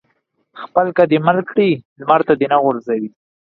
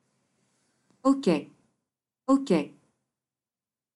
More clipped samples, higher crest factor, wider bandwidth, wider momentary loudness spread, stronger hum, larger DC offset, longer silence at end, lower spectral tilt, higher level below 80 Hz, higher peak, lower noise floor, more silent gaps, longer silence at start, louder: neither; about the same, 16 dB vs 20 dB; second, 5 kHz vs 11.5 kHz; about the same, 9 LU vs 11 LU; neither; neither; second, 0.5 s vs 1.25 s; first, -9.5 dB/octave vs -6.5 dB/octave; first, -60 dBFS vs -70 dBFS; first, 0 dBFS vs -12 dBFS; second, -65 dBFS vs under -90 dBFS; first, 1.85-1.96 s vs none; second, 0.55 s vs 1.05 s; first, -16 LUFS vs -26 LUFS